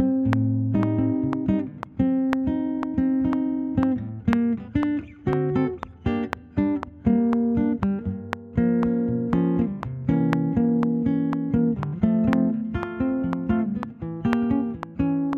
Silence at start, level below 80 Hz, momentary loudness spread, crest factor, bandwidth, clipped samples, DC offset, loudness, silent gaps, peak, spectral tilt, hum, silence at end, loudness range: 0 s; -44 dBFS; 7 LU; 20 dB; 5.8 kHz; under 0.1%; under 0.1%; -24 LUFS; none; -2 dBFS; -10 dB/octave; none; 0 s; 2 LU